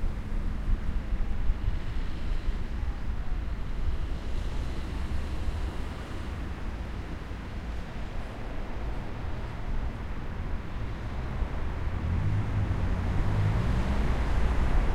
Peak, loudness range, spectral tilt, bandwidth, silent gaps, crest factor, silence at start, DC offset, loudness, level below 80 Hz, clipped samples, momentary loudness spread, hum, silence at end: -12 dBFS; 8 LU; -7 dB/octave; 9.2 kHz; none; 16 dB; 0 s; under 0.1%; -34 LUFS; -32 dBFS; under 0.1%; 9 LU; none; 0 s